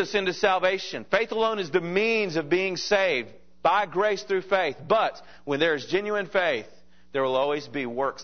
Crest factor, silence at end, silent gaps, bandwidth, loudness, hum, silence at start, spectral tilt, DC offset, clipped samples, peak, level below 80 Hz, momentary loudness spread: 20 dB; 0 s; none; 6.6 kHz; -25 LUFS; none; 0 s; -4.5 dB/octave; 0.4%; under 0.1%; -4 dBFS; -64 dBFS; 6 LU